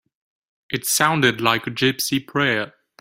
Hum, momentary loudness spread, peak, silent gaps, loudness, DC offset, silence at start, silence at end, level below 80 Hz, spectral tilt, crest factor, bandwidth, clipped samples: none; 9 LU; 0 dBFS; none; -20 LUFS; under 0.1%; 0.7 s; 0.3 s; -60 dBFS; -3 dB/octave; 20 dB; 16.5 kHz; under 0.1%